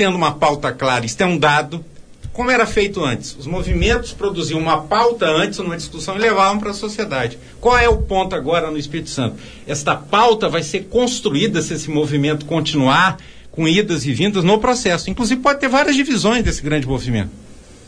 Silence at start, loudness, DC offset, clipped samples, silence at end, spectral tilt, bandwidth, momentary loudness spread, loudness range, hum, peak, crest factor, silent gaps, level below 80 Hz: 0 s; -17 LUFS; under 0.1%; under 0.1%; 0.1 s; -4.5 dB/octave; 10.5 kHz; 11 LU; 2 LU; none; -2 dBFS; 16 dB; none; -32 dBFS